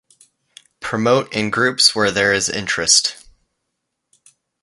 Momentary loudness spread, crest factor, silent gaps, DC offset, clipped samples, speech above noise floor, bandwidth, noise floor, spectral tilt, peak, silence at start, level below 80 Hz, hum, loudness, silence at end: 9 LU; 20 dB; none; under 0.1%; under 0.1%; 59 dB; 11.5 kHz; -76 dBFS; -2 dB/octave; 0 dBFS; 0.8 s; -54 dBFS; none; -16 LUFS; 1.5 s